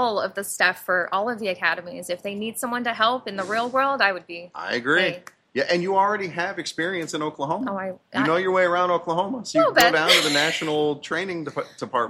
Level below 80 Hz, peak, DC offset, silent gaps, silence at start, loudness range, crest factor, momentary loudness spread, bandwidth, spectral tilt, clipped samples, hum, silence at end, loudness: -66 dBFS; 0 dBFS; under 0.1%; none; 0 s; 5 LU; 22 dB; 13 LU; 15 kHz; -3 dB/octave; under 0.1%; none; 0 s; -22 LUFS